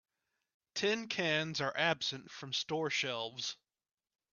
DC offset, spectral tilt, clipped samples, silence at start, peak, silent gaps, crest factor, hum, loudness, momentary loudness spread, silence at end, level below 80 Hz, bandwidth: under 0.1%; -3 dB/octave; under 0.1%; 0.75 s; -16 dBFS; none; 22 dB; none; -35 LUFS; 9 LU; 0.8 s; -80 dBFS; 7.4 kHz